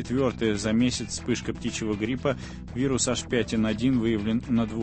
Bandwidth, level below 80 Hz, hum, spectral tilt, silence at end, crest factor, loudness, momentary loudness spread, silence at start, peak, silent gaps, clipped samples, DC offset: 8.8 kHz; -44 dBFS; none; -5 dB/octave; 0 s; 16 dB; -27 LUFS; 6 LU; 0 s; -10 dBFS; none; under 0.1%; under 0.1%